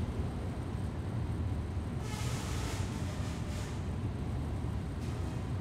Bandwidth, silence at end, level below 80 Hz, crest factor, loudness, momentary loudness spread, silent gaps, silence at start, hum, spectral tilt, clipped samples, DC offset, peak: 15.5 kHz; 0 s; -44 dBFS; 12 dB; -37 LUFS; 2 LU; none; 0 s; none; -6 dB/octave; under 0.1%; under 0.1%; -24 dBFS